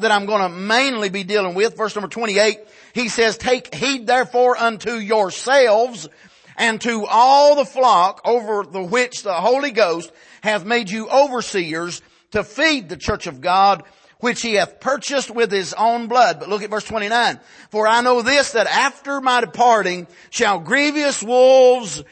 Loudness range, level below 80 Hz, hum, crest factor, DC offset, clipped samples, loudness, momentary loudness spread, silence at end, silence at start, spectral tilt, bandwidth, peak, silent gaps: 4 LU; -52 dBFS; none; 16 dB; under 0.1%; under 0.1%; -17 LUFS; 10 LU; 0.1 s; 0 s; -3 dB/octave; 8.8 kHz; -2 dBFS; none